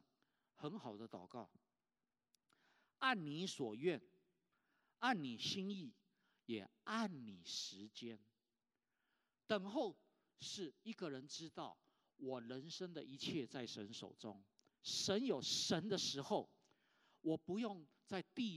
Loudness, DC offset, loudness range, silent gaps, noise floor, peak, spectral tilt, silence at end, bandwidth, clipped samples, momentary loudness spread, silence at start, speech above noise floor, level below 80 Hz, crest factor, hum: -45 LUFS; under 0.1%; 7 LU; none; under -90 dBFS; -22 dBFS; -3.5 dB/octave; 0 s; 13.5 kHz; under 0.1%; 15 LU; 0.6 s; over 45 dB; under -90 dBFS; 24 dB; none